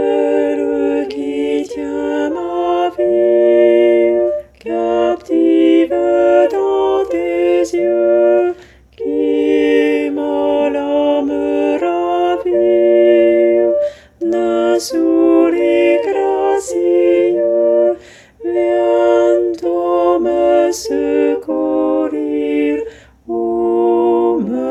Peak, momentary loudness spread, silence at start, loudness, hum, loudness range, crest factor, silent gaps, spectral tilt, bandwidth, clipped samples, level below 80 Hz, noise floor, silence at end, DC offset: 0 dBFS; 8 LU; 0 s; -14 LUFS; none; 3 LU; 14 dB; none; -5 dB/octave; 12 kHz; under 0.1%; -50 dBFS; -36 dBFS; 0 s; under 0.1%